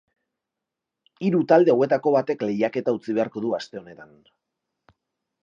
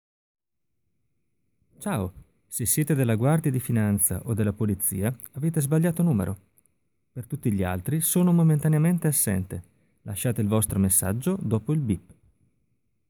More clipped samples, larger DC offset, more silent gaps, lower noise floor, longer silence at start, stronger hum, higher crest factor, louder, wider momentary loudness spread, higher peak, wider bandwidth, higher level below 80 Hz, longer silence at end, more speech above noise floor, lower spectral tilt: neither; neither; neither; first, -85 dBFS vs -80 dBFS; second, 1.2 s vs 1.8 s; neither; about the same, 20 dB vs 18 dB; about the same, -22 LUFS vs -24 LUFS; about the same, 12 LU vs 12 LU; first, -4 dBFS vs -8 dBFS; second, 7.4 kHz vs over 20 kHz; second, -74 dBFS vs -54 dBFS; first, 1.4 s vs 1.1 s; first, 63 dB vs 56 dB; first, -7.5 dB/octave vs -6 dB/octave